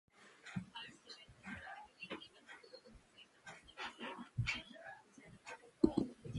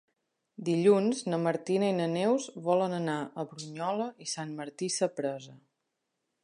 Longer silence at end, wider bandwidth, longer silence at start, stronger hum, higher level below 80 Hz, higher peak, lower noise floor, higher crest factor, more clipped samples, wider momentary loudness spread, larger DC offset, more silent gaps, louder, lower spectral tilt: second, 0 s vs 0.85 s; about the same, 11.5 kHz vs 11.5 kHz; second, 0.2 s vs 0.6 s; neither; first, -64 dBFS vs -82 dBFS; second, -16 dBFS vs -12 dBFS; second, -65 dBFS vs -83 dBFS; first, 30 dB vs 18 dB; neither; first, 22 LU vs 13 LU; neither; neither; second, -44 LUFS vs -30 LUFS; about the same, -6 dB/octave vs -5 dB/octave